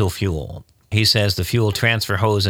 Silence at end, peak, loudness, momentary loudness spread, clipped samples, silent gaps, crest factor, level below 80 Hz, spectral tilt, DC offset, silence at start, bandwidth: 0 s; -2 dBFS; -18 LUFS; 13 LU; under 0.1%; none; 16 dB; -40 dBFS; -4.5 dB/octave; under 0.1%; 0 s; 18.5 kHz